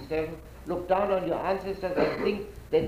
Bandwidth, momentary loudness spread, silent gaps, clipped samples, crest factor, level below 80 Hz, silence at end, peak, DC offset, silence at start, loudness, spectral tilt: 15.5 kHz; 10 LU; none; under 0.1%; 18 dB; -48 dBFS; 0 s; -12 dBFS; under 0.1%; 0 s; -29 LUFS; -7 dB/octave